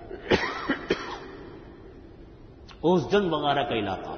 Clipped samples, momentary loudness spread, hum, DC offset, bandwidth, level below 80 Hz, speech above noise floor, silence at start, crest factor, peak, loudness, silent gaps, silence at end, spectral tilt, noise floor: under 0.1%; 24 LU; none; under 0.1%; 6.6 kHz; -50 dBFS; 22 dB; 0 s; 22 dB; -6 dBFS; -26 LUFS; none; 0 s; -6 dB/octave; -47 dBFS